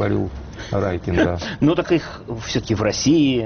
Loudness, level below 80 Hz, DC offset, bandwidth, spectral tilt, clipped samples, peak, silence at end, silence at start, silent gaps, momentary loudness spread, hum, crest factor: -20 LUFS; -38 dBFS; under 0.1%; 6.8 kHz; -5.5 dB/octave; under 0.1%; -6 dBFS; 0 s; 0 s; none; 12 LU; none; 14 dB